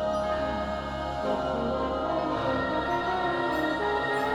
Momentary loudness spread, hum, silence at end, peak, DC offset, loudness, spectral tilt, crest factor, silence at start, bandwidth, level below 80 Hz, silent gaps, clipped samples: 4 LU; none; 0 s; -16 dBFS; under 0.1%; -28 LUFS; -6 dB/octave; 14 dB; 0 s; 18.5 kHz; -44 dBFS; none; under 0.1%